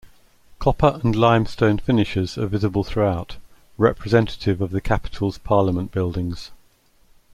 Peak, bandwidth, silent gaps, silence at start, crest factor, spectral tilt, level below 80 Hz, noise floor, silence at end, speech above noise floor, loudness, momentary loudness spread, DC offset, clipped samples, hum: -2 dBFS; 12.5 kHz; none; 0.05 s; 20 dB; -7.5 dB/octave; -36 dBFS; -56 dBFS; 0.8 s; 37 dB; -21 LUFS; 9 LU; under 0.1%; under 0.1%; none